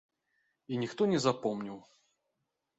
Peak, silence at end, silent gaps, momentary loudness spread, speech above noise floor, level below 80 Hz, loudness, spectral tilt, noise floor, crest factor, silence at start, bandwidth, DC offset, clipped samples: -16 dBFS; 0.95 s; none; 15 LU; 52 dB; -74 dBFS; -32 LUFS; -5.5 dB/octave; -84 dBFS; 20 dB; 0.7 s; 8.2 kHz; under 0.1%; under 0.1%